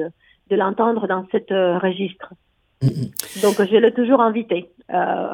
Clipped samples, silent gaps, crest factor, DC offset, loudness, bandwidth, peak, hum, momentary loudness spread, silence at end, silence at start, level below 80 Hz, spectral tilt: under 0.1%; none; 20 dB; under 0.1%; -19 LUFS; 17.5 kHz; 0 dBFS; none; 11 LU; 0 s; 0 s; -58 dBFS; -6 dB/octave